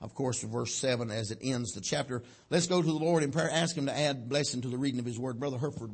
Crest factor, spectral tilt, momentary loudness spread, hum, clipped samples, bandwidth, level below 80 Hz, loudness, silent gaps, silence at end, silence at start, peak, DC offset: 18 dB; -4.5 dB/octave; 7 LU; none; under 0.1%; 8.8 kHz; -66 dBFS; -32 LUFS; none; 0 s; 0 s; -14 dBFS; under 0.1%